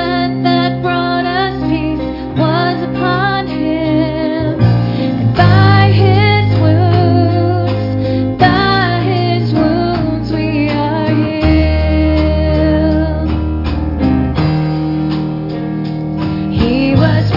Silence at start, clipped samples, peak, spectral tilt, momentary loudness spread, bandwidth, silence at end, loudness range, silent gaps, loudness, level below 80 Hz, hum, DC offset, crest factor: 0 s; under 0.1%; 0 dBFS; -9 dB/octave; 7 LU; 5.8 kHz; 0 s; 4 LU; none; -13 LUFS; -26 dBFS; none; under 0.1%; 12 dB